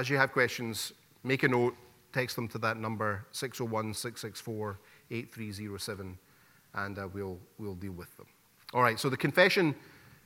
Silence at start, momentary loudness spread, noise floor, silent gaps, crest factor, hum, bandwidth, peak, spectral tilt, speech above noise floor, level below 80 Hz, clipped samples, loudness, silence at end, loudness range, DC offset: 0 s; 16 LU; -63 dBFS; none; 24 dB; none; 16.5 kHz; -8 dBFS; -4.5 dB/octave; 30 dB; -70 dBFS; under 0.1%; -32 LUFS; 0.25 s; 10 LU; under 0.1%